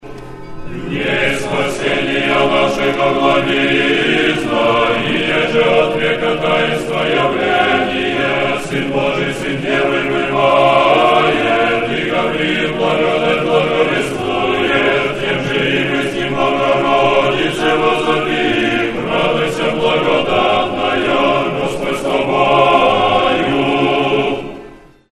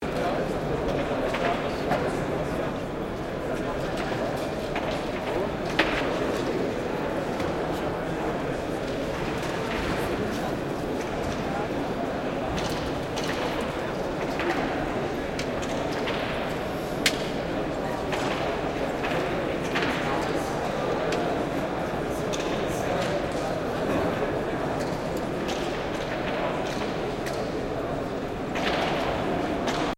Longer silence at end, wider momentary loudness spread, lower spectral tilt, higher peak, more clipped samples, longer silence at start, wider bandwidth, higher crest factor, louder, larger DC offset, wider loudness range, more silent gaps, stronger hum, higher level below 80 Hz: first, 0.35 s vs 0.05 s; about the same, 6 LU vs 4 LU; about the same, -5 dB/octave vs -5 dB/octave; first, 0 dBFS vs -6 dBFS; neither; about the same, 0.05 s vs 0 s; second, 13 kHz vs 16.5 kHz; second, 14 dB vs 22 dB; first, -14 LUFS vs -28 LUFS; neither; about the same, 2 LU vs 2 LU; neither; neither; about the same, -40 dBFS vs -44 dBFS